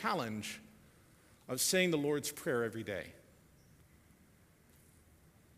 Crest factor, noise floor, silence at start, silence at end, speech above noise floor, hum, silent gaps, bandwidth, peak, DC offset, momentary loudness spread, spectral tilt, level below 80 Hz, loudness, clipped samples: 24 dB; -65 dBFS; 0 s; 2.4 s; 30 dB; none; none; 15.5 kHz; -16 dBFS; under 0.1%; 14 LU; -3.5 dB/octave; -70 dBFS; -35 LUFS; under 0.1%